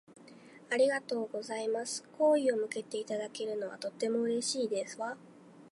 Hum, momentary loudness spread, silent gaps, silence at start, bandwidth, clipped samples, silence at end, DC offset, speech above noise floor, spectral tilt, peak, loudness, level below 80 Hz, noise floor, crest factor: none; 10 LU; none; 0.1 s; 11.5 kHz; under 0.1%; 0.05 s; under 0.1%; 22 dB; -3 dB/octave; -18 dBFS; -33 LUFS; -90 dBFS; -55 dBFS; 16 dB